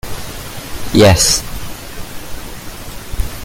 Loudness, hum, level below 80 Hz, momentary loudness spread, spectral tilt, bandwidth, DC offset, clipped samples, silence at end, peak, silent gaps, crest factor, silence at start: -12 LUFS; none; -28 dBFS; 21 LU; -4 dB/octave; 17 kHz; under 0.1%; under 0.1%; 0 s; 0 dBFS; none; 16 dB; 0.05 s